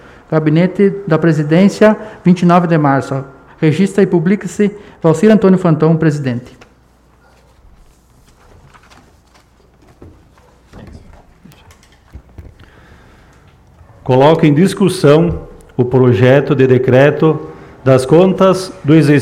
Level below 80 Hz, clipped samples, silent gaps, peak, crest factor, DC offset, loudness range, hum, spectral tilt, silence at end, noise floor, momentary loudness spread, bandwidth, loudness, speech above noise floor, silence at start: -42 dBFS; under 0.1%; none; 0 dBFS; 12 dB; under 0.1%; 7 LU; none; -7.5 dB/octave; 0 s; -49 dBFS; 10 LU; 13 kHz; -11 LUFS; 38 dB; 0.3 s